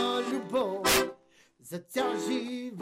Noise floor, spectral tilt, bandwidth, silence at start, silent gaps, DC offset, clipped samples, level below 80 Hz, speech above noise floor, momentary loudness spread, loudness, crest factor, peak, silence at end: -61 dBFS; -2.5 dB/octave; 16 kHz; 0 s; none; under 0.1%; under 0.1%; -56 dBFS; 29 dB; 12 LU; -29 LUFS; 16 dB; -14 dBFS; 0 s